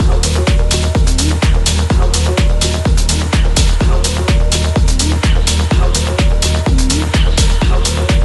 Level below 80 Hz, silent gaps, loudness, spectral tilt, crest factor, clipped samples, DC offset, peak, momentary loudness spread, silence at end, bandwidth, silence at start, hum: -12 dBFS; none; -13 LUFS; -4.5 dB/octave; 10 dB; under 0.1%; under 0.1%; 0 dBFS; 1 LU; 0 s; 12 kHz; 0 s; none